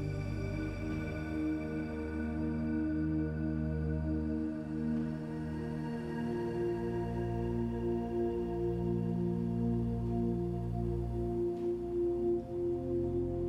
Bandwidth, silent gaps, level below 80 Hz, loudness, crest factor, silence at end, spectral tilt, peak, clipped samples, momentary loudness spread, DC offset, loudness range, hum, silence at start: 9.6 kHz; none; -46 dBFS; -35 LUFS; 12 dB; 0 s; -9.5 dB/octave; -22 dBFS; under 0.1%; 4 LU; under 0.1%; 2 LU; none; 0 s